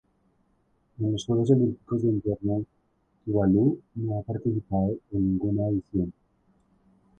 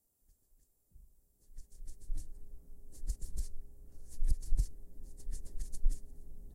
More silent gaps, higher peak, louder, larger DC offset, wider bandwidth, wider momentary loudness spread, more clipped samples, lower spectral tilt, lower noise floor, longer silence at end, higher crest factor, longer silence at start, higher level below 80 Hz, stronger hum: neither; first, -8 dBFS vs -16 dBFS; first, -27 LUFS vs -44 LUFS; neither; second, 8.8 kHz vs 12.5 kHz; second, 9 LU vs 20 LU; neither; first, -9 dB/octave vs -5 dB/octave; about the same, -68 dBFS vs -71 dBFS; first, 1.1 s vs 0 s; about the same, 20 dB vs 18 dB; second, 1 s vs 1.5 s; second, -50 dBFS vs -38 dBFS; neither